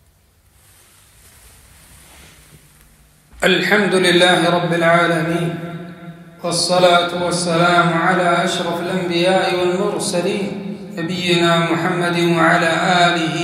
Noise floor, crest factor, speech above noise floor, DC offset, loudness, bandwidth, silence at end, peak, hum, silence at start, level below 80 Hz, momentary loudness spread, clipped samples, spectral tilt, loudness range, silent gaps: -54 dBFS; 16 dB; 38 dB; under 0.1%; -16 LUFS; 15 kHz; 0 s; 0 dBFS; none; 3.35 s; -54 dBFS; 12 LU; under 0.1%; -4.5 dB/octave; 3 LU; none